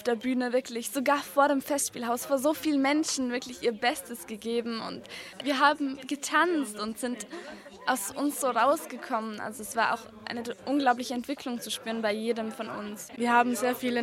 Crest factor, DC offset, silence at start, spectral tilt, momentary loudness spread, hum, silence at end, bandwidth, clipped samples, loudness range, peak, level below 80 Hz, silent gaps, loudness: 20 dB; under 0.1%; 0 s; -2.5 dB/octave; 12 LU; none; 0 s; 16 kHz; under 0.1%; 3 LU; -10 dBFS; -70 dBFS; none; -29 LUFS